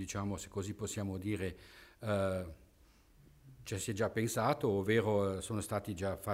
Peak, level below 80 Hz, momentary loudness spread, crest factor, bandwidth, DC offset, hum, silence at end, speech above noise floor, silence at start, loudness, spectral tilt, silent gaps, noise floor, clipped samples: -18 dBFS; -62 dBFS; 12 LU; 18 dB; 16 kHz; under 0.1%; none; 0 s; 29 dB; 0 s; -36 LUFS; -5.5 dB/octave; none; -65 dBFS; under 0.1%